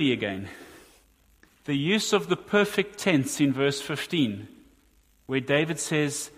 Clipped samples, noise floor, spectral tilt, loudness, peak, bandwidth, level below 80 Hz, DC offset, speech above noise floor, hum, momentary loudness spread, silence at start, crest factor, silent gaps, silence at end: under 0.1%; -62 dBFS; -4.5 dB/octave; -26 LUFS; -8 dBFS; 15.5 kHz; -64 dBFS; under 0.1%; 36 dB; none; 10 LU; 0 s; 20 dB; none; 0.1 s